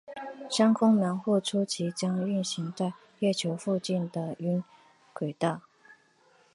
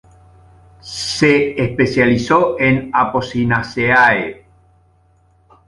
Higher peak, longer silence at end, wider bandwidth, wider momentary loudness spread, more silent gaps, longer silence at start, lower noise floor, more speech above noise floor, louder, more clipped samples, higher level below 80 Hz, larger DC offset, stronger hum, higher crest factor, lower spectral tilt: second, -12 dBFS vs 0 dBFS; second, 0.6 s vs 1.35 s; about the same, 11.5 kHz vs 11.5 kHz; first, 13 LU vs 9 LU; neither; second, 0.1 s vs 0.85 s; first, -63 dBFS vs -54 dBFS; second, 35 dB vs 39 dB; second, -29 LUFS vs -15 LUFS; neither; second, -76 dBFS vs -44 dBFS; neither; neither; about the same, 18 dB vs 16 dB; about the same, -5.5 dB/octave vs -5.5 dB/octave